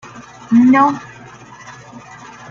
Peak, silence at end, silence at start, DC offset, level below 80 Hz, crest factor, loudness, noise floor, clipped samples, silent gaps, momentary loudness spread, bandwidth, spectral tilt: -2 dBFS; 0.8 s; 0.15 s; under 0.1%; -58 dBFS; 16 dB; -12 LUFS; -38 dBFS; under 0.1%; none; 26 LU; 7.2 kHz; -6.5 dB/octave